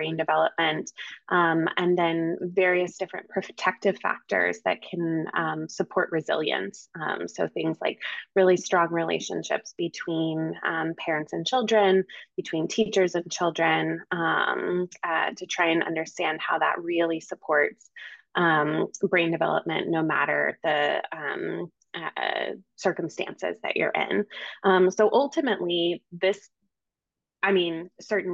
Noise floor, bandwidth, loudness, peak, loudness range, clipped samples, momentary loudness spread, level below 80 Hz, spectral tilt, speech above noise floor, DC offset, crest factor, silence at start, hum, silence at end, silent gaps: -89 dBFS; 7.8 kHz; -26 LUFS; -8 dBFS; 3 LU; under 0.1%; 10 LU; -76 dBFS; -4.5 dB/octave; 63 dB; under 0.1%; 18 dB; 0 s; none; 0 s; none